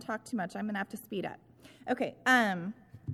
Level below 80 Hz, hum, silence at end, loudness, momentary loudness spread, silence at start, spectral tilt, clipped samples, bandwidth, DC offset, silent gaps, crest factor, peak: -72 dBFS; none; 0 s; -32 LUFS; 18 LU; 0 s; -5 dB/octave; under 0.1%; 15.5 kHz; under 0.1%; none; 22 dB; -12 dBFS